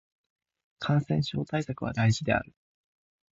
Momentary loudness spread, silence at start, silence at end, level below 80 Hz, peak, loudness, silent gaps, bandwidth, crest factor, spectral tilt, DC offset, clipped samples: 7 LU; 0.8 s; 0.9 s; -54 dBFS; -12 dBFS; -29 LUFS; none; 8 kHz; 18 dB; -6.5 dB/octave; under 0.1%; under 0.1%